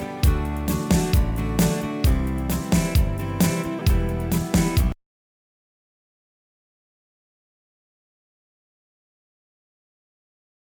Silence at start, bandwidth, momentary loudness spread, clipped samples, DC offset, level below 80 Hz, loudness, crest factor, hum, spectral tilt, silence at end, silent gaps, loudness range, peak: 0 s; over 20 kHz; 5 LU; under 0.1%; under 0.1%; -28 dBFS; -23 LUFS; 16 dB; none; -6 dB/octave; 5.85 s; none; 6 LU; -8 dBFS